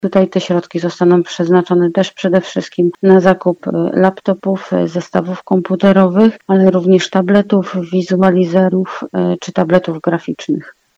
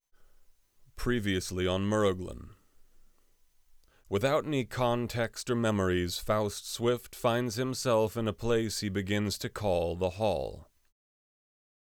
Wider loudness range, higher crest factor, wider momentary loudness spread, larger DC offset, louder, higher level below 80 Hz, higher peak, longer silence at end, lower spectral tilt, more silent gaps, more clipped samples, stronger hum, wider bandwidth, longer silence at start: about the same, 2 LU vs 3 LU; second, 12 dB vs 18 dB; first, 8 LU vs 5 LU; neither; first, -13 LUFS vs -31 LUFS; about the same, -56 dBFS vs -52 dBFS; first, 0 dBFS vs -14 dBFS; second, 0.3 s vs 1.25 s; first, -7.5 dB/octave vs -5 dB/octave; neither; first, 0.2% vs under 0.1%; neither; second, 7.8 kHz vs over 20 kHz; second, 0.05 s vs 0.95 s